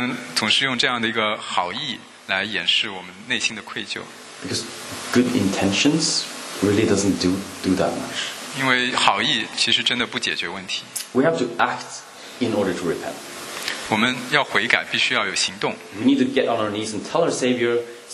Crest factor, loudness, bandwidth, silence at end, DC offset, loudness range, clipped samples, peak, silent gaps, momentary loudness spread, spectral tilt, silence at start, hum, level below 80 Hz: 22 dB; -21 LUFS; 13.5 kHz; 0 s; under 0.1%; 4 LU; under 0.1%; 0 dBFS; none; 11 LU; -3 dB/octave; 0 s; none; -60 dBFS